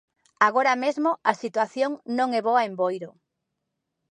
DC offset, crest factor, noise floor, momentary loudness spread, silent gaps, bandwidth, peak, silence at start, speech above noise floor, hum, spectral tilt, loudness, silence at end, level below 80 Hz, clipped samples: under 0.1%; 22 dB; -81 dBFS; 7 LU; none; 10.5 kHz; -4 dBFS; 0.4 s; 57 dB; none; -4.5 dB/octave; -24 LUFS; 1.05 s; -82 dBFS; under 0.1%